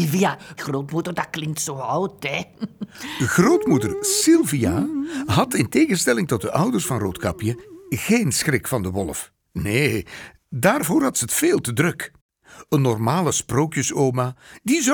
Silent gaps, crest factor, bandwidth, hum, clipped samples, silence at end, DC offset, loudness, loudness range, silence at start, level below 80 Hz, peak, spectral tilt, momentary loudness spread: 12.21-12.29 s; 18 dB; over 20 kHz; none; under 0.1%; 0 s; under 0.1%; -21 LUFS; 4 LU; 0 s; -50 dBFS; -4 dBFS; -4.5 dB/octave; 13 LU